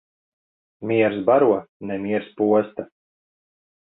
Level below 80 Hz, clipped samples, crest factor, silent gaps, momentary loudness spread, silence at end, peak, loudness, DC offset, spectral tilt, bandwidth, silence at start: -64 dBFS; under 0.1%; 18 dB; 1.69-1.80 s; 16 LU; 1.1 s; -4 dBFS; -21 LUFS; under 0.1%; -11 dB/octave; 4 kHz; 0.8 s